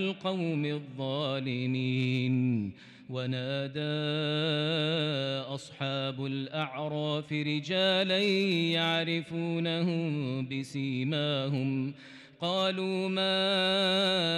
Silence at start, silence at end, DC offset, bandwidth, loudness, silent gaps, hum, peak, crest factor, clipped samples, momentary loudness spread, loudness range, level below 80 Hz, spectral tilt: 0 s; 0 s; under 0.1%; 12 kHz; -30 LUFS; none; none; -18 dBFS; 12 dB; under 0.1%; 9 LU; 3 LU; -78 dBFS; -6 dB/octave